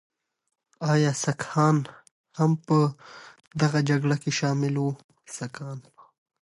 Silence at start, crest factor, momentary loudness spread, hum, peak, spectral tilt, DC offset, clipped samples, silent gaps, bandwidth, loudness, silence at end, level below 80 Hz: 0.8 s; 16 dB; 18 LU; none; -10 dBFS; -6 dB/octave; under 0.1%; under 0.1%; 2.11-2.24 s, 5.04-5.09 s; 11.5 kHz; -25 LUFS; 0.65 s; -68 dBFS